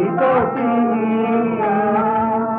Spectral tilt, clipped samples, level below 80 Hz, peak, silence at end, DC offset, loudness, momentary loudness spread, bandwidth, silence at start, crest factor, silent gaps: -11.5 dB/octave; under 0.1%; -52 dBFS; -6 dBFS; 0 s; under 0.1%; -17 LUFS; 2 LU; 3.8 kHz; 0 s; 10 dB; none